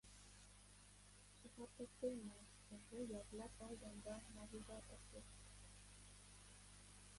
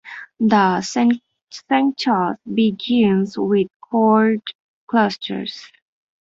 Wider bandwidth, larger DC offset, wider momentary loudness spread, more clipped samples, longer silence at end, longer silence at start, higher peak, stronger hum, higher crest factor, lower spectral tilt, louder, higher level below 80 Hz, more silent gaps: first, 11.5 kHz vs 7.8 kHz; neither; about the same, 14 LU vs 14 LU; neither; second, 0 s vs 0.55 s; about the same, 0.05 s vs 0.05 s; second, -36 dBFS vs -2 dBFS; first, 50 Hz at -65 dBFS vs none; first, 22 dB vs 16 dB; second, -4.5 dB/octave vs -6 dB/octave; second, -57 LUFS vs -18 LUFS; second, -68 dBFS vs -62 dBFS; second, none vs 1.42-1.47 s, 3.76-3.80 s, 4.55-4.88 s